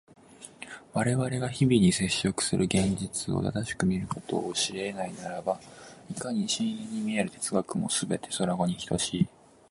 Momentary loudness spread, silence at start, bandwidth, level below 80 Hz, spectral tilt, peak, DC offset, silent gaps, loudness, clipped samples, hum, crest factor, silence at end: 11 LU; 0.3 s; 11.5 kHz; -54 dBFS; -4.5 dB/octave; -10 dBFS; under 0.1%; none; -29 LUFS; under 0.1%; none; 18 dB; 0.4 s